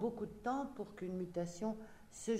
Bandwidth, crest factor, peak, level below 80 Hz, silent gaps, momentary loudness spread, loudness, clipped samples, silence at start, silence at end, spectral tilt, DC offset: 15.5 kHz; 16 dB; -26 dBFS; -66 dBFS; none; 7 LU; -43 LUFS; under 0.1%; 0 s; 0 s; -6 dB/octave; under 0.1%